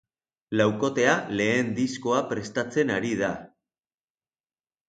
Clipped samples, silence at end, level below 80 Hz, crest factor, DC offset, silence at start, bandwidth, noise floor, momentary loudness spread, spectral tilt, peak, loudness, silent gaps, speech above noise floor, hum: under 0.1%; 1.4 s; -64 dBFS; 20 dB; under 0.1%; 0.5 s; 9.2 kHz; under -90 dBFS; 7 LU; -5 dB/octave; -8 dBFS; -25 LUFS; none; over 65 dB; none